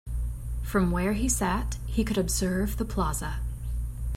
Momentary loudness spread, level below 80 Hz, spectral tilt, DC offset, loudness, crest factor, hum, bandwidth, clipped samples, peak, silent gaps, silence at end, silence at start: 9 LU; -32 dBFS; -5 dB/octave; under 0.1%; -29 LUFS; 14 dB; none; 16.5 kHz; under 0.1%; -12 dBFS; none; 0 s; 0.05 s